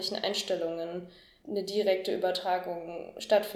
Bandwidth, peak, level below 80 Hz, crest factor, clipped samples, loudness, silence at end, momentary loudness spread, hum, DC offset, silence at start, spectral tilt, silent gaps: 17.5 kHz; -12 dBFS; -72 dBFS; 18 dB; under 0.1%; -31 LUFS; 0 s; 13 LU; none; under 0.1%; 0 s; -3.5 dB/octave; none